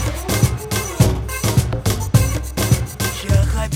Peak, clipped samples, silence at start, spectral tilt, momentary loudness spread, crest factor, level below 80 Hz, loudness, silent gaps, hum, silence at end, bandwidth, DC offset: 0 dBFS; under 0.1%; 0 s; -5 dB/octave; 5 LU; 18 dB; -26 dBFS; -19 LUFS; none; none; 0 s; 17 kHz; under 0.1%